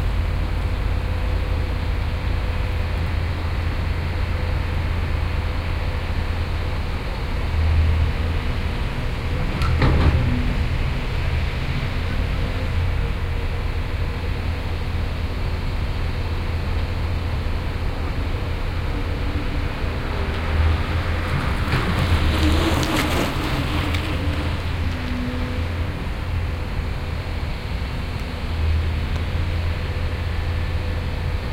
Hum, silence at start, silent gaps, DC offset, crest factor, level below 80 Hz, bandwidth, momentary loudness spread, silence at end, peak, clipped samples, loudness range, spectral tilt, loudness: none; 0 s; none; under 0.1%; 18 dB; -24 dBFS; 15.5 kHz; 6 LU; 0 s; -4 dBFS; under 0.1%; 5 LU; -6.5 dB/octave; -24 LUFS